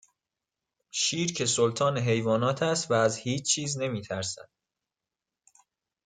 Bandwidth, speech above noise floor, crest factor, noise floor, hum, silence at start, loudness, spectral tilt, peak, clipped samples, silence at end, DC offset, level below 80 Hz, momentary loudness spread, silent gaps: 9.6 kHz; 62 dB; 18 dB; -89 dBFS; none; 0.95 s; -27 LUFS; -3.5 dB/octave; -10 dBFS; under 0.1%; 1.65 s; under 0.1%; -68 dBFS; 8 LU; none